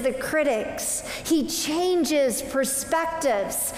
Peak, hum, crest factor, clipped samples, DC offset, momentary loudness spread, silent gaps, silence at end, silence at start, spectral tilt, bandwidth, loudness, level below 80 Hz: -12 dBFS; none; 14 dB; under 0.1%; under 0.1%; 4 LU; none; 0 s; 0 s; -2.5 dB/octave; 16 kHz; -24 LUFS; -52 dBFS